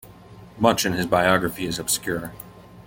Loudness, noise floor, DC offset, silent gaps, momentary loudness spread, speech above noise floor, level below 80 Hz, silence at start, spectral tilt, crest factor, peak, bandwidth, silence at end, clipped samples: -22 LUFS; -45 dBFS; under 0.1%; none; 18 LU; 23 dB; -50 dBFS; 0.05 s; -3.5 dB/octave; 22 dB; -2 dBFS; 17 kHz; 0.05 s; under 0.1%